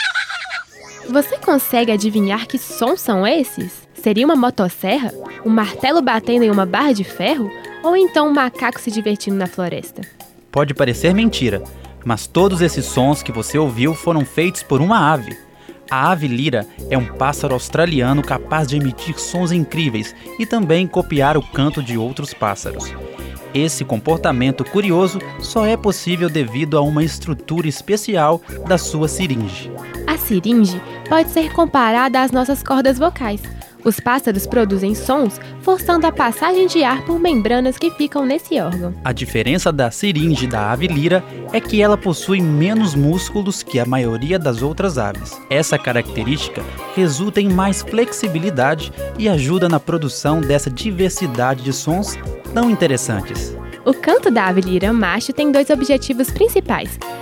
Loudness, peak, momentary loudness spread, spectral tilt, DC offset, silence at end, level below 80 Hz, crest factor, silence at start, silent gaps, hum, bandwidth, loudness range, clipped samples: -17 LUFS; -2 dBFS; 9 LU; -5.5 dB/octave; under 0.1%; 0 s; -36 dBFS; 16 dB; 0 s; none; none; 18 kHz; 3 LU; under 0.1%